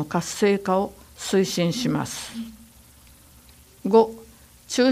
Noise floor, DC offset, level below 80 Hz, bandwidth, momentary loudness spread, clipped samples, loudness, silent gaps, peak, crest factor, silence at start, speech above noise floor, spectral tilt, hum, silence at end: -51 dBFS; under 0.1%; -56 dBFS; 15.5 kHz; 15 LU; under 0.1%; -23 LUFS; none; -4 dBFS; 20 dB; 0 s; 28 dB; -5 dB/octave; 60 Hz at -50 dBFS; 0 s